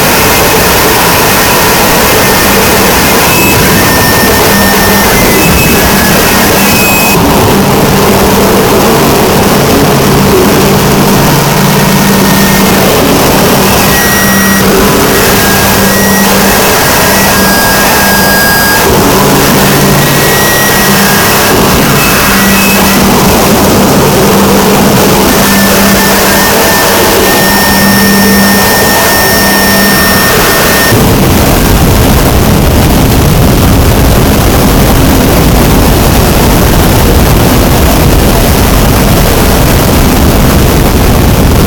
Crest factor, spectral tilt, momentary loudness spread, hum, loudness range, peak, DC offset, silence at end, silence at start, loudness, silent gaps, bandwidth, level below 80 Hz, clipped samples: 4 dB; -4 dB/octave; 2 LU; none; 1 LU; 0 dBFS; under 0.1%; 0 s; 0 s; -4 LUFS; none; over 20 kHz; -14 dBFS; 4%